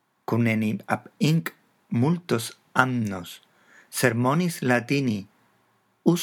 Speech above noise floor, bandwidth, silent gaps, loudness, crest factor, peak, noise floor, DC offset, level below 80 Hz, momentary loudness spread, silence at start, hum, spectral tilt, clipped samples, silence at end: 42 dB; 19.5 kHz; none; -25 LUFS; 24 dB; 0 dBFS; -66 dBFS; under 0.1%; -76 dBFS; 11 LU; 0.3 s; none; -6 dB/octave; under 0.1%; 0 s